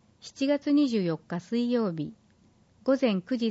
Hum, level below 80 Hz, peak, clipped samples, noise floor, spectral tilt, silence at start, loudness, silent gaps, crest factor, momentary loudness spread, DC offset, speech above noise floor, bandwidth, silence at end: none; -72 dBFS; -14 dBFS; under 0.1%; -62 dBFS; -6.5 dB/octave; 0.25 s; -28 LUFS; none; 14 dB; 11 LU; under 0.1%; 35 dB; 8 kHz; 0 s